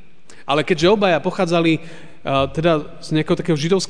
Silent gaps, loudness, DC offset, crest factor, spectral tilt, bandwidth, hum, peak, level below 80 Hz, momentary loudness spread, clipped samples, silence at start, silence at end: none; -18 LUFS; 2%; 16 dB; -5.5 dB/octave; 10 kHz; none; -4 dBFS; -46 dBFS; 7 LU; under 0.1%; 0.5 s; 0.05 s